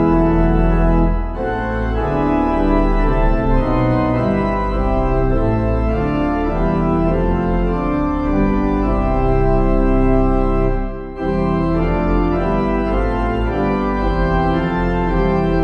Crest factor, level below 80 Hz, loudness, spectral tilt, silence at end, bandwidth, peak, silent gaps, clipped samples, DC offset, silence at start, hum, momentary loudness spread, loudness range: 14 dB; -20 dBFS; -17 LUFS; -9.5 dB/octave; 0 s; 5.6 kHz; -2 dBFS; none; under 0.1%; under 0.1%; 0 s; none; 3 LU; 1 LU